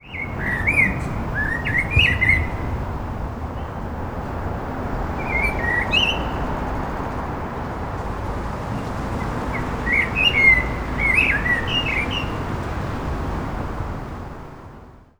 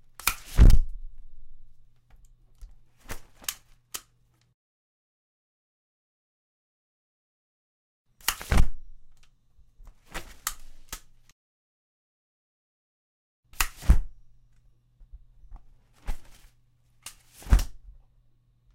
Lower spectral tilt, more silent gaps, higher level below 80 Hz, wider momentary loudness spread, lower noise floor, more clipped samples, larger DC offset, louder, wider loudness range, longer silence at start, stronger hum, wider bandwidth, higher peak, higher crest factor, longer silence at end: about the same, -5 dB/octave vs -4 dB/octave; second, none vs 4.54-8.05 s, 11.32-13.43 s; about the same, -32 dBFS vs -30 dBFS; second, 13 LU vs 24 LU; second, -43 dBFS vs -65 dBFS; neither; neither; first, -21 LUFS vs -28 LUFS; about the same, 9 LU vs 10 LU; second, 0.05 s vs 0.25 s; neither; first, over 20 kHz vs 16 kHz; first, -2 dBFS vs -6 dBFS; about the same, 20 dB vs 22 dB; second, 0.15 s vs 1 s